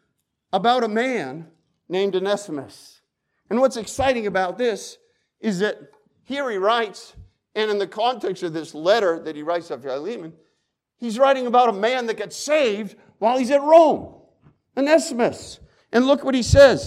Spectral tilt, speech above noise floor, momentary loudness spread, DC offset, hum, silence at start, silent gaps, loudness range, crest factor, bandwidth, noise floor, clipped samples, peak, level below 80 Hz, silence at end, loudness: -5 dB/octave; 54 dB; 16 LU; under 0.1%; none; 0.55 s; none; 6 LU; 18 dB; 13.5 kHz; -74 dBFS; under 0.1%; -2 dBFS; -44 dBFS; 0 s; -21 LUFS